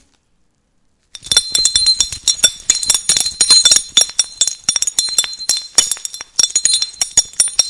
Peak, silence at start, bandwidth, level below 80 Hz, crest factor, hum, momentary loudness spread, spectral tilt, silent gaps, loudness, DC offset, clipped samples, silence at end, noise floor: 0 dBFS; 1.25 s; 12 kHz; -46 dBFS; 16 dB; none; 7 LU; 2.5 dB/octave; none; -12 LUFS; under 0.1%; 0.4%; 0 s; -60 dBFS